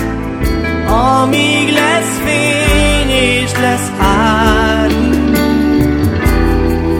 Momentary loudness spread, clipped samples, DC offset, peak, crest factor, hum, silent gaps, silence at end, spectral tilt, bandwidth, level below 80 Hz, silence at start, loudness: 4 LU; under 0.1%; under 0.1%; 0 dBFS; 12 dB; none; none; 0 s; -5 dB/octave; 17.5 kHz; -20 dBFS; 0 s; -12 LUFS